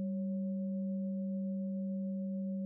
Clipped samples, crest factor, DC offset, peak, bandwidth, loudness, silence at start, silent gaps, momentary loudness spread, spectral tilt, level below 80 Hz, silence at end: under 0.1%; 6 dB; under 0.1%; -32 dBFS; 0.6 kHz; -38 LUFS; 0 s; none; 1 LU; -18 dB/octave; under -90 dBFS; 0 s